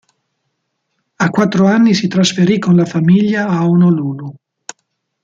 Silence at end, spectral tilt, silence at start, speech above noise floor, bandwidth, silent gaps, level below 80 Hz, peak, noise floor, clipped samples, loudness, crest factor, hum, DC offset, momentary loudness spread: 0.9 s; -6 dB/octave; 1.2 s; 58 dB; 7.8 kHz; none; -56 dBFS; -2 dBFS; -70 dBFS; under 0.1%; -12 LUFS; 12 dB; none; under 0.1%; 21 LU